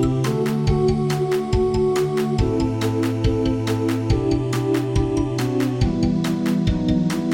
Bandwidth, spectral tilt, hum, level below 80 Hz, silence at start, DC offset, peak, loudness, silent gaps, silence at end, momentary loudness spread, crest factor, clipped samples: 17 kHz; -7 dB/octave; none; -32 dBFS; 0 s; under 0.1%; -6 dBFS; -21 LUFS; none; 0 s; 2 LU; 14 dB; under 0.1%